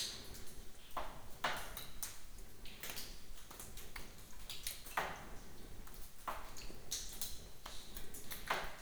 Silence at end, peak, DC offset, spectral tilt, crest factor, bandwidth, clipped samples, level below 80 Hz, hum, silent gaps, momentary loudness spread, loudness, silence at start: 0 s; -22 dBFS; under 0.1%; -1.5 dB/octave; 22 dB; over 20 kHz; under 0.1%; -54 dBFS; none; none; 14 LU; -47 LUFS; 0 s